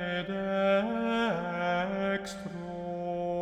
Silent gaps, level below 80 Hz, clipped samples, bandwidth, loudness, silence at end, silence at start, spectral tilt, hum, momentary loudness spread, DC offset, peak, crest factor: none; -60 dBFS; under 0.1%; 13 kHz; -31 LUFS; 0 s; 0 s; -6 dB/octave; none; 11 LU; under 0.1%; -14 dBFS; 16 dB